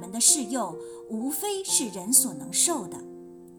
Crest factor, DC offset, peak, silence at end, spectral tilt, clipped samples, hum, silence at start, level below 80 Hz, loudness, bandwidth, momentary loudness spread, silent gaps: 22 dB; under 0.1%; -6 dBFS; 0 s; -1.5 dB/octave; under 0.1%; none; 0 s; -70 dBFS; -23 LUFS; 19.5 kHz; 20 LU; none